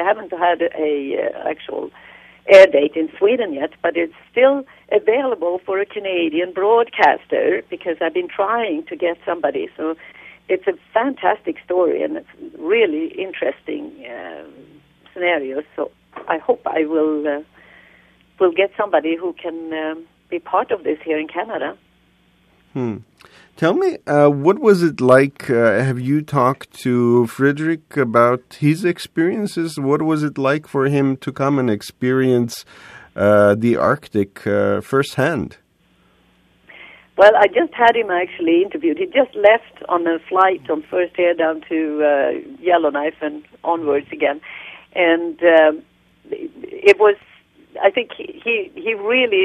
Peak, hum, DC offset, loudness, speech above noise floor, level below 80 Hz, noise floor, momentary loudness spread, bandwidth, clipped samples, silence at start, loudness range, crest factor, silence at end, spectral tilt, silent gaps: 0 dBFS; none; under 0.1%; -18 LUFS; 40 dB; -62 dBFS; -58 dBFS; 14 LU; 13.5 kHz; under 0.1%; 0 s; 7 LU; 18 dB; 0 s; -6.5 dB/octave; none